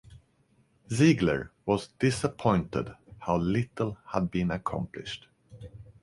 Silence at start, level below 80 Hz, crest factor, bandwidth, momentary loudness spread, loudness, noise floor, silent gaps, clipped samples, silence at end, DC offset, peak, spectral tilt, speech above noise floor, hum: 0.1 s; -52 dBFS; 20 dB; 11.5 kHz; 18 LU; -29 LUFS; -67 dBFS; none; under 0.1%; 0.2 s; under 0.1%; -10 dBFS; -6.5 dB/octave; 39 dB; none